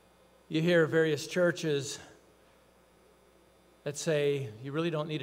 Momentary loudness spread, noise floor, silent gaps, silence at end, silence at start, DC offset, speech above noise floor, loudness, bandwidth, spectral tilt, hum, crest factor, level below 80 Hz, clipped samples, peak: 14 LU; -62 dBFS; none; 0 s; 0.5 s; under 0.1%; 33 dB; -30 LUFS; 16 kHz; -5 dB/octave; 60 Hz at -65 dBFS; 18 dB; -74 dBFS; under 0.1%; -14 dBFS